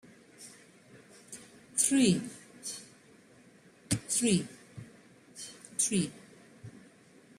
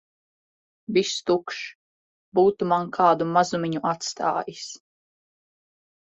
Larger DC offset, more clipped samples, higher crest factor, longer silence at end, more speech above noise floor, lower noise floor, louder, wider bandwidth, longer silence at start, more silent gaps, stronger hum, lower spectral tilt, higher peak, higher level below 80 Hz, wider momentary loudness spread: neither; neither; about the same, 22 dB vs 20 dB; second, 0.6 s vs 1.25 s; second, 31 dB vs over 67 dB; second, -59 dBFS vs under -90 dBFS; second, -30 LUFS vs -23 LUFS; first, 15.5 kHz vs 8.2 kHz; second, 0.4 s vs 0.9 s; second, none vs 1.75-2.32 s; neither; about the same, -3.5 dB/octave vs -4.5 dB/octave; second, -14 dBFS vs -6 dBFS; about the same, -68 dBFS vs -68 dBFS; first, 25 LU vs 17 LU